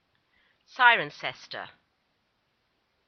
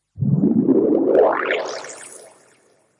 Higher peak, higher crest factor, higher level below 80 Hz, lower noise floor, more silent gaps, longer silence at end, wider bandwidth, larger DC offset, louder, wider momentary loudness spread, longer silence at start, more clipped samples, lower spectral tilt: about the same, -6 dBFS vs -4 dBFS; first, 24 dB vs 14 dB; second, -82 dBFS vs -58 dBFS; first, -74 dBFS vs -58 dBFS; neither; first, 1.4 s vs 0.8 s; second, 6.6 kHz vs 11.5 kHz; neither; second, -23 LUFS vs -18 LUFS; first, 24 LU vs 19 LU; first, 0.8 s vs 0.15 s; neither; second, 1.5 dB/octave vs -7 dB/octave